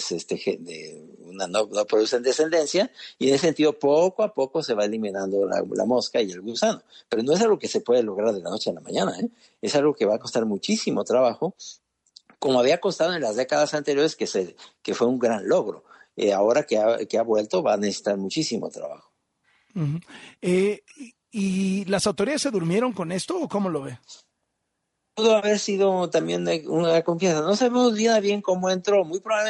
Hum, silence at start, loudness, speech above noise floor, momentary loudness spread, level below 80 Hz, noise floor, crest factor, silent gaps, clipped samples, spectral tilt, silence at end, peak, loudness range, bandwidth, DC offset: none; 0 s; -23 LUFS; 55 dB; 11 LU; -68 dBFS; -78 dBFS; 16 dB; none; under 0.1%; -4.5 dB/octave; 0 s; -8 dBFS; 4 LU; 11.5 kHz; under 0.1%